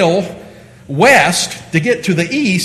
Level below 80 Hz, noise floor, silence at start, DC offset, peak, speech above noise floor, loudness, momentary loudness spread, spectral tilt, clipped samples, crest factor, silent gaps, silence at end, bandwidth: -48 dBFS; -37 dBFS; 0 s; under 0.1%; 0 dBFS; 24 dB; -12 LUFS; 11 LU; -4 dB/octave; 0.2%; 14 dB; none; 0 s; 13.5 kHz